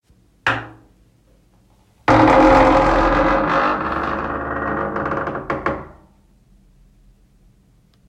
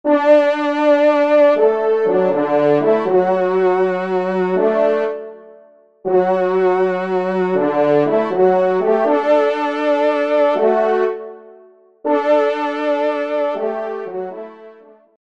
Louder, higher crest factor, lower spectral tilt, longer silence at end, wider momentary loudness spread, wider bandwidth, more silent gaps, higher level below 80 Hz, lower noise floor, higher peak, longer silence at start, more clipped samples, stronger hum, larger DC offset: about the same, -17 LUFS vs -16 LUFS; about the same, 18 dB vs 14 dB; about the same, -6.5 dB/octave vs -7.5 dB/octave; first, 2.2 s vs 0.6 s; about the same, 13 LU vs 11 LU; first, 10 kHz vs 7.4 kHz; neither; first, -34 dBFS vs -68 dBFS; first, -55 dBFS vs -47 dBFS; about the same, 0 dBFS vs -2 dBFS; first, 0.45 s vs 0.05 s; neither; neither; second, under 0.1% vs 0.3%